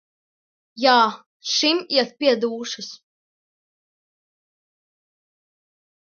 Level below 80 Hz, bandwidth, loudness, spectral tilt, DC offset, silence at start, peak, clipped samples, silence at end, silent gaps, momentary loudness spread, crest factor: -78 dBFS; 7.2 kHz; -20 LUFS; -2 dB/octave; under 0.1%; 0.75 s; 0 dBFS; under 0.1%; 3.1 s; 1.26-1.40 s; 15 LU; 24 dB